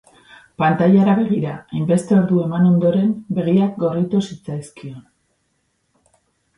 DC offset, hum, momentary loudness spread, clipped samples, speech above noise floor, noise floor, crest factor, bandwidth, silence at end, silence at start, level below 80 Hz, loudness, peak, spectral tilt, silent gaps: under 0.1%; none; 16 LU; under 0.1%; 51 dB; -68 dBFS; 16 dB; 11 kHz; 1.55 s; 0.6 s; -58 dBFS; -17 LUFS; -4 dBFS; -8.5 dB/octave; none